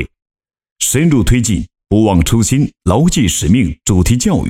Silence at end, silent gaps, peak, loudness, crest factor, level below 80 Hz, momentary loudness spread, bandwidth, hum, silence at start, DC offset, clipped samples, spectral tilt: 0 s; 0.22-0.26 s, 0.72-0.76 s; -2 dBFS; -13 LUFS; 12 dB; -24 dBFS; 5 LU; 17 kHz; none; 0 s; under 0.1%; under 0.1%; -5 dB/octave